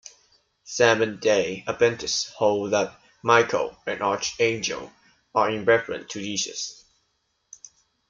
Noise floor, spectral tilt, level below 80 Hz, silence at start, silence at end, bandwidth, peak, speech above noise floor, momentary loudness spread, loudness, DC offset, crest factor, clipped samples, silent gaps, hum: -72 dBFS; -3 dB/octave; -62 dBFS; 0.65 s; 1.35 s; 7.6 kHz; -4 dBFS; 49 dB; 12 LU; -24 LUFS; under 0.1%; 22 dB; under 0.1%; none; none